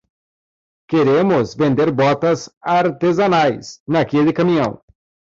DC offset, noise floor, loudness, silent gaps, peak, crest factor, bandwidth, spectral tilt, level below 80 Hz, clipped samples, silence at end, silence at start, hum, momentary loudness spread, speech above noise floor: under 0.1%; under -90 dBFS; -16 LUFS; 2.57-2.61 s, 3.80-3.86 s; -4 dBFS; 12 dB; 7.8 kHz; -7 dB/octave; -54 dBFS; under 0.1%; 0.65 s; 0.9 s; none; 6 LU; over 74 dB